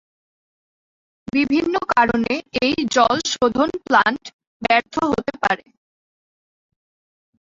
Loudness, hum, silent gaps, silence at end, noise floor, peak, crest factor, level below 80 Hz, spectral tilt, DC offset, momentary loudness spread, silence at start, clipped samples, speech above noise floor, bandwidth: -19 LUFS; none; 4.33-4.39 s, 4.47-4.60 s; 1.85 s; under -90 dBFS; -2 dBFS; 20 dB; -52 dBFS; -3.5 dB/octave; under 0.1%; 6 LU; 1.35 s; under 0.1%; over 71 dB; 7.8 kHz